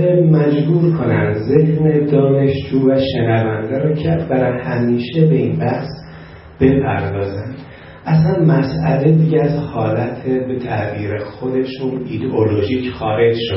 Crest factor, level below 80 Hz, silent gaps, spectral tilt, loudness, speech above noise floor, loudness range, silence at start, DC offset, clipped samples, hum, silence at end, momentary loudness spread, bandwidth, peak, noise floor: 14 dB; -44 dBFS; none; -12.5 dB/octave; -16 LUFS; 21 dB; 4 LU; 0 s; under 0.1%; under 0.1%; none; 0 s; 10 LU; 5.8 kHz; 0 dBFS; -36 dBFS